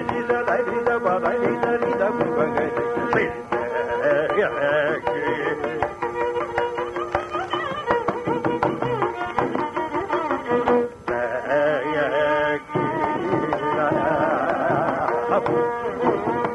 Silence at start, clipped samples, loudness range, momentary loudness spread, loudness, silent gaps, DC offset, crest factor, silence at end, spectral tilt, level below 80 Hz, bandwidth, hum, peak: 0 s; under 0.1%; 3 LU; 5 LU; -23 LUFS; none; under 0.1%; 16 dB; 0 s; -6.5 dB/octave; -52 dBFS; 11.5 kHz; none; -6 dBFS